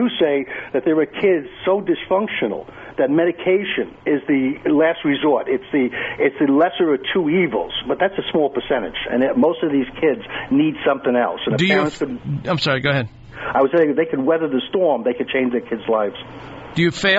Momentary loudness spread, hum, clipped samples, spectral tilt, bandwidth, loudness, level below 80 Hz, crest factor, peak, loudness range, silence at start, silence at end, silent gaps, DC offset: 7 LU; none; under 0.1%; -4 dB/octave; 8 kHz; -19 LUFS; -50 dBFS; 14 dB; -4 dBFS; 2 LU; 0 s; 0 s; none; under 0.1%